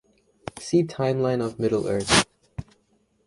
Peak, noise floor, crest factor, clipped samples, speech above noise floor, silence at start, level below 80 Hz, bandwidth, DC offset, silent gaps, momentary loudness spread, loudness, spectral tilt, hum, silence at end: -4 dBFS; -66 dBFS; 22 dB; under 0.1%; 43 dB; 0.55 s; -50 dBFS; 11.5 kHz; under 0.1%; none; 21 LU; -23 LUFS; -4 dB/octave; none; 0.65 s